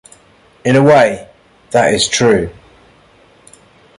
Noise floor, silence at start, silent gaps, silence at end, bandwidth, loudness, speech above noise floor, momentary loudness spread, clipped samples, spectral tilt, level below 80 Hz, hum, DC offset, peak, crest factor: -48 dBFS; 0.65 s; none; 1.45 s; 11.5 kHz; -12 LUFS; 37 dB; 13 LU; under 0.1%; -4.5 dB/octave; -44 dBFS; none; under 0.1%; 0 dBFS; 14 dB